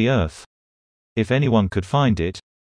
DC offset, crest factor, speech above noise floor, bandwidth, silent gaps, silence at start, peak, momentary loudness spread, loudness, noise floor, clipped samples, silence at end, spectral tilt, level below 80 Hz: under 0.1%; 16 dB; over 71 dB; 10.5 kHz; 0.46-1.16 s; 0 s; -6 dBFS; 10 LU; -21 LUFS; under -90 dBFS; under 0.1%; 0.2 s; -7 dB/octave; -40 dBFS